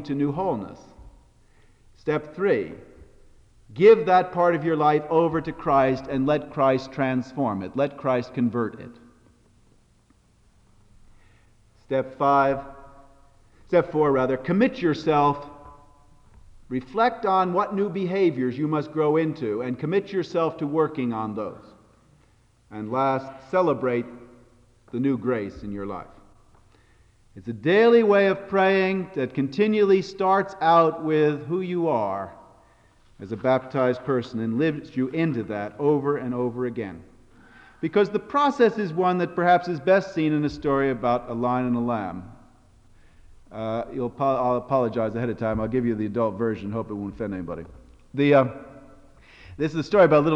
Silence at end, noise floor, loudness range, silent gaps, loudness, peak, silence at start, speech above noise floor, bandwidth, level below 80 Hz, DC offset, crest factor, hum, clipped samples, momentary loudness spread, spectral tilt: 0 s; -60 dBFS; 7 LU; none; -23 LUFS; -6 dBFS; 0 s; 37 dB; 8 kHz; -54 dBFS; under 0.1%; 18 dB; none; under 0.1%; 14 LU; -8 dB/octave